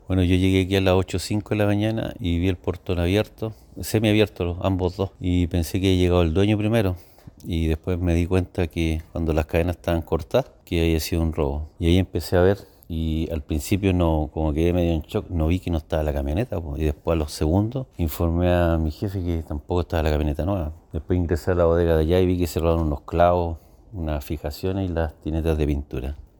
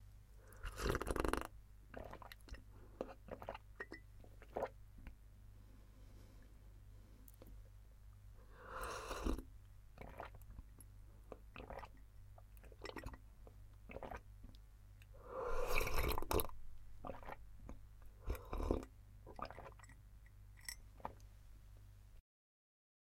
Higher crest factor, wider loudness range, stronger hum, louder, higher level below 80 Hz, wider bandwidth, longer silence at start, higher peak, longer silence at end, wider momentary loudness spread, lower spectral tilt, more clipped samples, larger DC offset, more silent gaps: second, 18 dB vs 30 dB; second, 3 LU vs 13 LU; second, none vs 50 Hz at -60 dBFS; first, -23 LUFS vs -48 LUFS; first, -32 dBFS vs -52 dBFS; first, 19 kHz vs 16 kHz; about the same, 0.1 s vs 0 s; first, -4 dBFS vs -18 dBFS; second, 0.2 s vs 1 s; second, 9 LU vs 22 LU; first, -7 dB/octave vs -5 dB/octave; neither; neither; neither